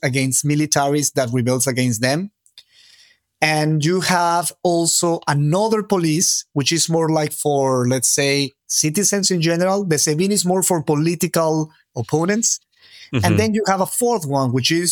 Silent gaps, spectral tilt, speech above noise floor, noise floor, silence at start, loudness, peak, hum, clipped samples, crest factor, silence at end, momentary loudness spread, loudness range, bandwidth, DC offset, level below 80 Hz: none; -4 dB/octave; 35 dB; -53 dBFS; 0.05 s; -18 LUFS; 0 dBFS; none; under 0.1%; 18 dB; 0 s; 4 LU; 3 LU; 19.5 kHz; under 0.1%; -62 dBFS